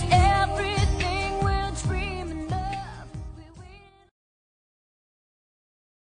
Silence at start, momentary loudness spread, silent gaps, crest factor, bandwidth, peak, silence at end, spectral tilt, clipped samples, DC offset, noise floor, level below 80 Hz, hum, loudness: 0 s; 21 LU; none; 22 dB; 10 kHz; -6 dBFS; 2.4 s; -5 dB/octave; under 0.1%; under 0.1%; -49 dBFS; -34 dBFS; none; -26 LUFS